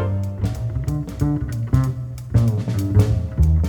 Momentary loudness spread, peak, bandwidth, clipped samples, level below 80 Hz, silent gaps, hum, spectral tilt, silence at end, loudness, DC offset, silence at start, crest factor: 7 LU; -4 dBFS; 18 kHz; under 0.1%; -26 dBFS; none; none; -8.5 dB/octave; 0 s; -21 LUFS; under 0.1%; 0 s; 16 dB